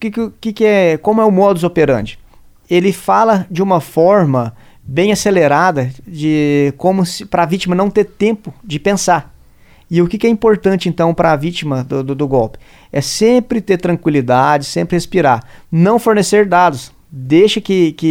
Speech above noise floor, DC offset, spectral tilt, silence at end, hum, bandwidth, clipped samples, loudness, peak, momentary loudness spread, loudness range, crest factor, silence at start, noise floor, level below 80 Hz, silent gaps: 31 dB; under 0.1%; -6 dB/octave; 0 s; none; 16.5 kHz; under 0.1%; -13 LUFS; 0 dBFS; 9 LU; 2 LU; 14 dB; 0 s; -44 dBFS; -42 dBFS; none